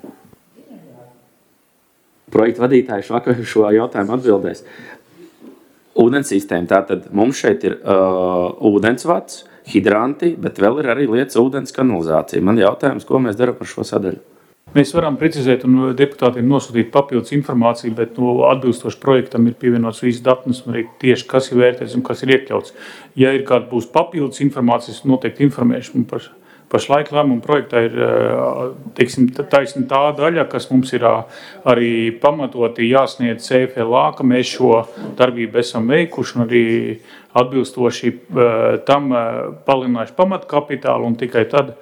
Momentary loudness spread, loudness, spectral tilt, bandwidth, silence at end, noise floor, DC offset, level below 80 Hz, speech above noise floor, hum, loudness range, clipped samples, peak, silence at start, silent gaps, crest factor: 7 LU; -16 LUFS; -6.5 dB/octave; 14.5 kHz; 0.1 s; -58 dBFS; under 0.1%; -58 dBFS; 43 dB; none; 2 LU; under 0.1%; 0 dBFS; 0.05 s; none; 16 dB